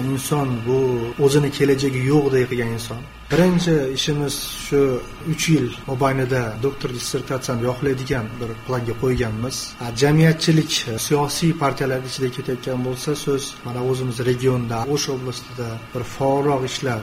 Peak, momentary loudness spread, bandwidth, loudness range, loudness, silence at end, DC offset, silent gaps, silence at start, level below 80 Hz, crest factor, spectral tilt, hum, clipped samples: -2 dBFS; 10 LU; 16 kHz; 4 LU; -21 LUFS; 0 s; under 0.1%; none; 0 s; -42 dBFS; 18 dB; -5.5 dB/octave; none; under 0.1%